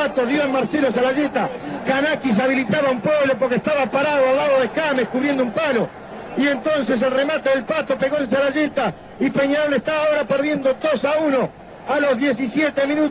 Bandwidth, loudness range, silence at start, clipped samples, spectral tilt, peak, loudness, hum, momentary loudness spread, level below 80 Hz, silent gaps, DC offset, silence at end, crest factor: 4 kHz; 2 LU; 0 s; under 0.1%; -9.5 dB/octave; -6 dBFS; -19 LUFS; none; 4 LU; -54 dBFS; none; under 0.1%; 0 s; 12 dB